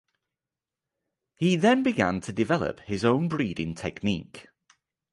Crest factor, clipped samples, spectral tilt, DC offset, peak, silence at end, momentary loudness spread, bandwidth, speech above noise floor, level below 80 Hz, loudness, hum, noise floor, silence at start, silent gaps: 20 dB; under 0.1%; -6 dB/octave; under 0.1%; -8 dBFS; 0.7 s; 10 LU; 11.5 kHz; 64 dB; -54 dBFS; -26 LUFS; none; -90 dBFS; 1.4 s; none